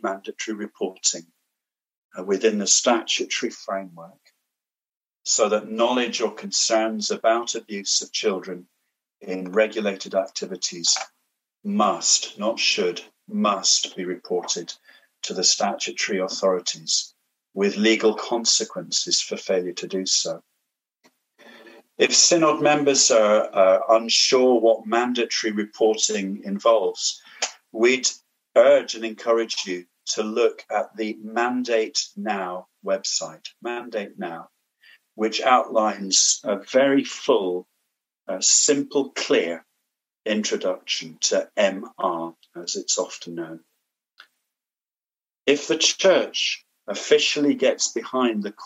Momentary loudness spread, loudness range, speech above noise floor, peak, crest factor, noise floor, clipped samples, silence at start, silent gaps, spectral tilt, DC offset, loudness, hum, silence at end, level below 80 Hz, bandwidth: 15 LU; 7 LU; over 68 dB; -2 dBFS; 20 dB; under -90 dBFS; under 0.1%; 0.05 s; 1.97-2.10 s, 4.97-5.01 s; -2 dB/octave; under 0.1%; -21 LUFS; none; 0 s; -88 dBFS; 9.8 kHz